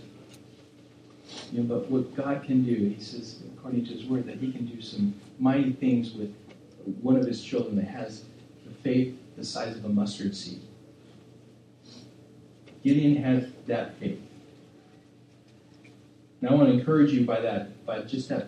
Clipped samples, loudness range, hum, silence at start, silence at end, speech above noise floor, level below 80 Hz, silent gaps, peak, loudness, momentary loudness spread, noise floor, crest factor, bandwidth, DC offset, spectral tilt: under 0.1%; 6 LU; none; 0 s; 0 s; 29 dB; -72 dBFS; none; -8 dBFS; -28 LUFS; 18 LU; -55 dBFS; 22 dB; 9.6 kHz; under 0.1%; -7.5 dB/octave